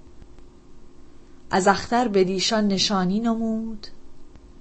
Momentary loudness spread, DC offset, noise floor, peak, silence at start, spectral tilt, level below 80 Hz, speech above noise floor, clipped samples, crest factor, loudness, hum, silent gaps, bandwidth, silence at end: 12 LU; under 0.1%; -43 dBFS; -4 dBFS; 0 s; -4.5 dB/octave; -46 dBFS; 22 dB; under 0.1%; 20 dB; -22 LUFS; none; none; 8.8 kHz; 0 s